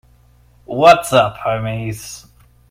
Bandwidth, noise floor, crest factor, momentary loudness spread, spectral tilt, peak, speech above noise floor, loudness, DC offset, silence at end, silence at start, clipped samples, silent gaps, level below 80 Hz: 16 kHz; -50 dBFS; 18 dB; 20 LU; -4.5 dB/octave; 0 dBFS; 36 dB; -14 LUFS; under 0.1%; 0.5 s; 0.7 s; 0.2%; none; -46 dBFS